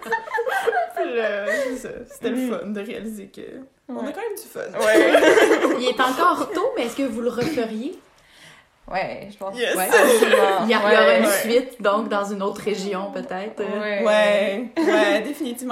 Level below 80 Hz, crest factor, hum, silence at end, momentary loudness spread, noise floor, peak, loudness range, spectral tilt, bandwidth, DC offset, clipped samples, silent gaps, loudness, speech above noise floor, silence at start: -60 dBFS; 18 dB; none; 0 s; 16 LU; -49 dBFS; -2 dBFS; 9 LU; -3.5 dB/octave; 16 kHz; under 0.1%; under 0.1%; none; -20 LUFS; 29 dB; 0 s